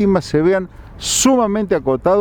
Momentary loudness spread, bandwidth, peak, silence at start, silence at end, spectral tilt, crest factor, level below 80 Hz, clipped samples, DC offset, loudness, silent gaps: 8 LU; over 20 kHz; 0 dBFS; 0 s; 0 s; -4 dB/octave; 16 dB; -40 dBFS; under 0.1%; under 0.1%; -16 LUFS; none